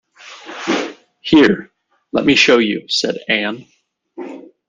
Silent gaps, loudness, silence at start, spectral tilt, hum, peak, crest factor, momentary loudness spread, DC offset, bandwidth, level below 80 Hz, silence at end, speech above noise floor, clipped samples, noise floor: none; -15 LUFS; 0.25 s; -4 dB/octave; none; 0 dBFS; 18 dB; 21 LU; under 0.1%; 9.6 kHz; -52 dBFS; 0.3 s; 23 dB; under 0.1%; -37 dBFS